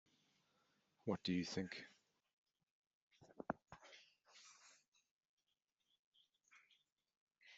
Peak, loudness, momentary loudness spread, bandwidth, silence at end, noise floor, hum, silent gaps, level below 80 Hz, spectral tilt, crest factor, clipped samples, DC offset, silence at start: -24 dBFS; -47 LUFS; 23 LU; 8 kHz; 0 s; under -90 dBFS; none; 2.33-2.44 s, 2.71-3.11 s, 4.88-4.92 s, 5.11-5.19 s, 5.29-5.38 s, 5.99-6.12 s, 6.92-6.96 s, 7.17-7.27 s; -84 dBFS; -4.5 dB/octave; 28 dB; under 0.1%; under 0.1%; 1.05 s